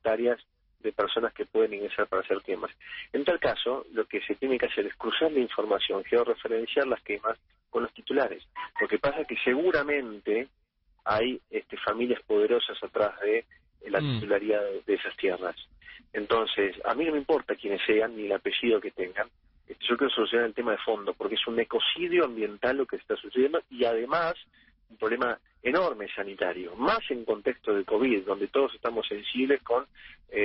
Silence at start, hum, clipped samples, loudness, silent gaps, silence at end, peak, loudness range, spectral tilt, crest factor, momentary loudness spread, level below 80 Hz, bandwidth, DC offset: 0.05 s; none; under 0.1%; -29 LUFS; none; 0 s; -12 dBFS; 2 LU; -2 dB/octave; 16 dB; 8 LU; -62 dBFS; 5.6 kHz; under 0.1%